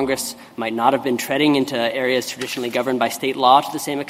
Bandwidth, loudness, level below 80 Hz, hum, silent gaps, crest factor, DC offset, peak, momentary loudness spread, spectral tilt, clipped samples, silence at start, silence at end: 16 kHz; -19 LUFS; -62 dBFS; none; none; 20 dB; under 0.1%; 0 dBFS; 10 LU; -3.5 dB/octave; under 0.1%; 0 s; 0 s